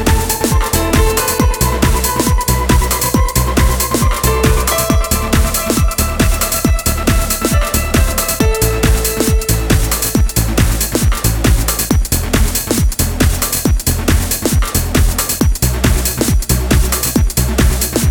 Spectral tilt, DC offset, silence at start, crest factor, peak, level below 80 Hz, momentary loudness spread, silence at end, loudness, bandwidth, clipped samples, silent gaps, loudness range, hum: -4 dB/octave; under 0.1%; 0 s; 12 dB; 0 dBFS; -16 dBFS; 2 LU; 0 s; -14 LUFS; 19 kHz; under 0.1%; none; 1 LU; none